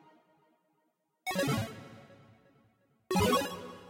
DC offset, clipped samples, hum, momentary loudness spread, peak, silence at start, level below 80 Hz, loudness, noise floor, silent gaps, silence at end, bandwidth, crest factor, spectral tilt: under 0.1%; under 0.1%; none; 17 LU; -18 dBFS; 1.25 s; -58 dBFS; -32 LUFS; -78 dBFS; none; 0 s; 16 kHz; 18 dB; -4.5 dB/octave